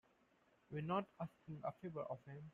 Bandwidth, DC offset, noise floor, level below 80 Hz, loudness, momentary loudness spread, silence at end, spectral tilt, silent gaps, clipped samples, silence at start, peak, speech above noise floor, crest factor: 7 kHz; under 0.1%; -76 dBFS; -78 dBFS; -47 LUFS; 9 LU; 0.05 s; -9 dB/octave; none; under 0.1%; 0.7 s; -28 dBFS; 29 dB; 20 dB